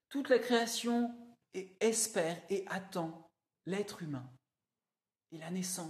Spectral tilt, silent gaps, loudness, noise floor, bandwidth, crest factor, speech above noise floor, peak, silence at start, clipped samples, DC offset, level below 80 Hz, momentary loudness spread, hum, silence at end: -3.5 dB/octave; none; -35 LUFS; under -90 dBFS; 14.5 kHz; 20 dB; over 55 dB; -18 dBFS; 0.1 s; under 0.1%; under 0.1%; -86 dBFS; 17 LU; none; 0 s